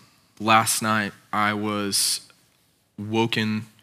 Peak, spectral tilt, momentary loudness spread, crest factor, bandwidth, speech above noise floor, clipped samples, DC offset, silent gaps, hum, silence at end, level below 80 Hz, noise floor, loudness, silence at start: -2 dBFS; -3 dB/octave; 10 LU; 24 dB; 16 kHz; 41 dB; under 0.1%; under 0.1%; none; none; 0.2 s; -74 dBFS; -64 dBFS; -23 LUFS; 0.4 s